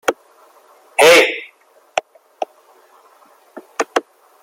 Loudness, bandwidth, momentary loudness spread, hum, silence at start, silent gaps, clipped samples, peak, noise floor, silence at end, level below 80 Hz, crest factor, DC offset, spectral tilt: -15 LUFS; 16.5 kHz; 21 LU; none; 0.05 s; none; under 0.1%; 0 dBFS; -51 dBFS; 0.45 s; -66 dBFS; 20 dB; under 0.1%; -1 dB/octave